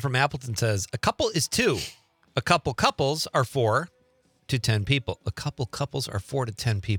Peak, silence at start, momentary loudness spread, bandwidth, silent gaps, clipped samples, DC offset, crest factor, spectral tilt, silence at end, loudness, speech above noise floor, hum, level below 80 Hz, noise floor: -4 dBFS; 0 s; 8 LU; 19.5 kHz; none; under 0.1%; under 0.1%; 22 dB; -4.5 dB/octave; 0 s; -26 LUFS; 39 dB; none; -52 dBFS; -65 dBFS